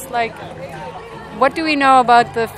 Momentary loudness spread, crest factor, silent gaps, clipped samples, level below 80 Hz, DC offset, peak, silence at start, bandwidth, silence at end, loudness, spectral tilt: 20 LU; 16 dB; none; under 0.1%; -48 dBFS; under 0.1%; 0 dBFS; 0 s; 15 kHz; 0 s; -14 LUFS; -4.5 dB/octave